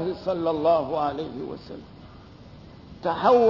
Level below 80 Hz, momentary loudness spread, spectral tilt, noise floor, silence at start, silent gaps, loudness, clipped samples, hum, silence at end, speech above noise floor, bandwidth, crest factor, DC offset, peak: -54 dBFS; 25 LU; -7.5 dB/octave; -46 dBFS; 0 s; none; -25 LUFS; under 0.1%; none; 0 s; 23 dB; 6 kHz; 18 dB; under 0.1%; -8 dBFS